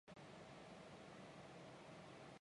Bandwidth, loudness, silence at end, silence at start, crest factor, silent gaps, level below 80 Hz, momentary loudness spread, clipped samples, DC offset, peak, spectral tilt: 11 kHz; -59 LUFS; 0 s; 0.05 s; 12 dB; none; -82 dBFS; 1 LU; under 0.1%; under 0.1%; -48 dBFS; -5 dB/octave